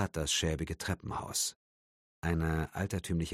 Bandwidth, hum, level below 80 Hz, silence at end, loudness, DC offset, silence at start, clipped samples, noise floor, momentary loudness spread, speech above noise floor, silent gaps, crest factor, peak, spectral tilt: 16 kHz; none; -46 dBFS; 0 s; -34 LUFS; under 0.1%; 0 s; under 0.1%; under -90 dBFS; 6 LU; over 56 dB; 1.56-2.22 s; 18 dB; -16 dBFS; -4 dB/octave